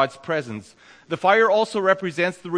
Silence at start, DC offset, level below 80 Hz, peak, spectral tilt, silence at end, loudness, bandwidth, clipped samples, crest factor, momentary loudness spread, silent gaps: 0 s; under 0.1%; -70 dBFS; -4 dBFS; -5 dB/octave; 0 s; -20 LUFS; 10.5 kHz; under 0.1%; 18 dB; 15 LU; none